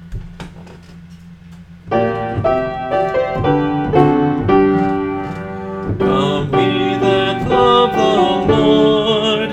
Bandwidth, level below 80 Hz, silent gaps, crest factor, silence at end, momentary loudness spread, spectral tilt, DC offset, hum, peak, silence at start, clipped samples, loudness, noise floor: 8.6 kHz; -38 dBFS; none; 14 dB; 0 s; 13 LU; -7 dB/octave; under 0.1%; none; 0 dBFS; 0 s; under 0.1%; -15 LUFS; -37 dBFS